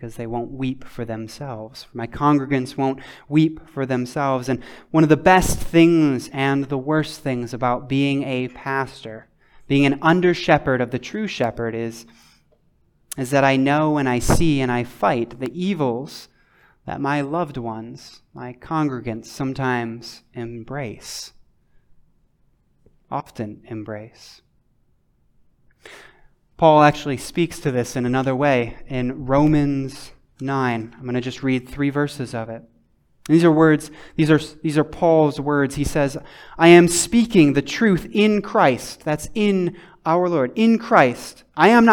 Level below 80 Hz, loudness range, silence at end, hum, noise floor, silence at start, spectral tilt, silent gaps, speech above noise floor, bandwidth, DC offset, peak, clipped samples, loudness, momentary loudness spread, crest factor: -42 dBFS; 15 LU; 0 s; none; -61 dBFS; 0 s; -6 dB/octave; none; 42 dB; 18 kHz; under 0.1%; 0 dBFS; under 0.1%; -19 LUFS; 17 LU; 20 dB